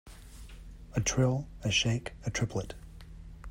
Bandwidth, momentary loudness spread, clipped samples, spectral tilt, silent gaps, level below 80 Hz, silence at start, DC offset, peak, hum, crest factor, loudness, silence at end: 15.5 kHz; 23 LU; under 0.1%; -4 dB/octave; none; -48 dBFS; 0.05 s; under 0.1%; -16 dBFS; none; 18 dB; -31 LUFS; 0 s